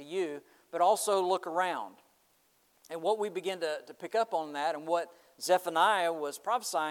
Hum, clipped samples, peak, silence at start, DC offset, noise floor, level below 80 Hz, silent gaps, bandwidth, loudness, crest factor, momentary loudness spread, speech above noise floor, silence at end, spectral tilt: none; under 0.1%; -12 dBFS; 0 s; under 0.1%; -69 dBFS; under -90 dBFS; none; 18.5 kHz; -31 LUFS; 20 dB; 13 LU; 39 dB; 0 s; -2.5 dB/octave